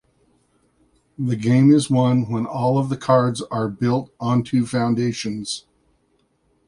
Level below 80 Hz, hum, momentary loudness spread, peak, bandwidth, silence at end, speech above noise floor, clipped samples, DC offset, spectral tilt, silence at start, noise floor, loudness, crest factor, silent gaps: -58 dBFS; none; 11 LU; -2 dBFS; 11.5 kHz; 1.1 s; 46 dB; under 0.1%; under 0.1%; -7 dB/octave; 1.2 s; -65 dBFS; -20 LUFS; 18 dB; none